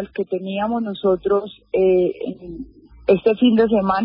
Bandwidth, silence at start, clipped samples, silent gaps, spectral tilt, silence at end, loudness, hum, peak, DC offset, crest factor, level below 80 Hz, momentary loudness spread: 5.4 kHz; 0 s; under 0.1%; none; -11.5 dB/octave; 0 s; -19 LUFS; none; -4 dBFS; under 0.1%; 16 dB; -50 dBFS; 16 LU